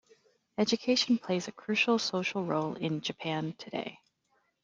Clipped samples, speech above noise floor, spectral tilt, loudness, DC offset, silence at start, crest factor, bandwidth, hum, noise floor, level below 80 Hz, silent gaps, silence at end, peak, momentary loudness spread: under 0.1%; 44 dB; -4.5 dB/octave; -31 LUFS; under 0.1%; 0.6 s; 18 dB; 7.8 kHz; none; -75 dBFS; -74 dBFS; none; 0.7 s; -14 dBFS; 11 LU